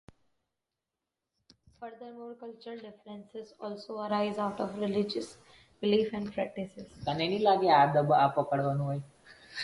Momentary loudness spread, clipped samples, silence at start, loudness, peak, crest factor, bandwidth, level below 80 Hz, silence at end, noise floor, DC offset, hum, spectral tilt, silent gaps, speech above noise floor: 21 LU; under 0.1%; 1.8 s; -29 LUFS; -10 dBFS; 20 dB; 11.5 kHz; -66 dBFS; 0 s; -88 dBFS; under 0.1%; none; -6.5 dB/octave; none; 58 dB